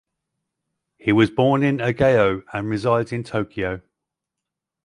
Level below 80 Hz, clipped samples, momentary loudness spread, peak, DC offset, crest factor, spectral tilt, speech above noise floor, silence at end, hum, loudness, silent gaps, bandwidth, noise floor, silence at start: -50 dBFS; under 0.1%; 10 LU; -4 dBFS; under 0.1%; 18 dB; -7.5 dB/octave; 65 dB; 1.05 s; none; -20 LUFS; none; 11 kHz; -84 dBFS; 1.05 s